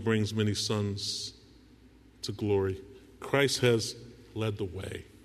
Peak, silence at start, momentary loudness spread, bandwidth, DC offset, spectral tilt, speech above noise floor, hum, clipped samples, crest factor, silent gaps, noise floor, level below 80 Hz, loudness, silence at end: -12 dBFS; 0 s; 15 LU; 13.5 kHz; under 0.1%; -4.5 dB/octave; 27 dB; none; under 0.1%; 20 dB; none; -57 dBFS; -60 dBFS; -31 LUFS; 0.2 s